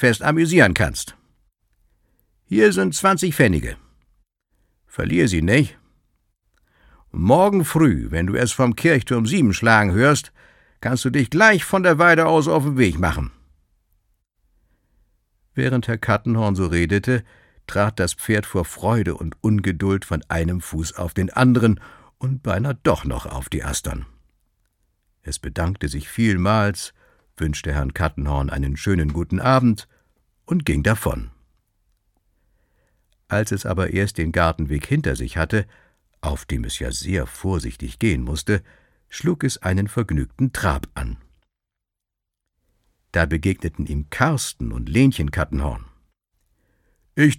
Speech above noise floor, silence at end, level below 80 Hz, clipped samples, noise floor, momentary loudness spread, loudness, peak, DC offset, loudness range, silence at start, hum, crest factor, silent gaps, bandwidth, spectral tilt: 65 dB; 0 s; -34 dBFS; under 0.1%; -84 dBFS; 13 LU; -20 LUFS; 0 dBFS; under 0.1%; 9 LU; 0 s; none; 20 dB; none; 17 kHz; -5.5 dB/octave